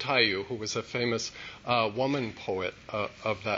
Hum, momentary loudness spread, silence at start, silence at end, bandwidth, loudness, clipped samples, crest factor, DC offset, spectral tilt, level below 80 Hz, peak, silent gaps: none; 9 LU; 0 s; 0 s; 8 kHz; -30 LUFS; under 0.1%; 20 dB; under 0.1%; -4 dB/octave; -62 dBFS; -10 dBFS; none